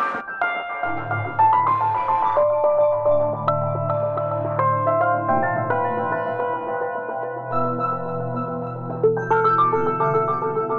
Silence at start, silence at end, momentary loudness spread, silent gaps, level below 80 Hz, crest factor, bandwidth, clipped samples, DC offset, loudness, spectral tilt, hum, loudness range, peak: 0 s; 0 s; 8 LU; none; -58 dBFS; 14 dB; 6.6 kHz; under 0.1%; under 0.1%; -21 LUFS; -9 dB/octave; none; 5 LU; -8 dBFS